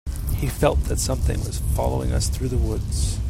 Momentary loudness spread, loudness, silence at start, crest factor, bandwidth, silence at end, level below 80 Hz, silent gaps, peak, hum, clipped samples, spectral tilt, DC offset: 5 LU; -24 LUFS; 0.05 s; 18 dB; 16.5 kHz; 0 s; -26 dBFS; none; -4 dBFS; none; under 0.1%; -5.5 dB/octave; under 0.1%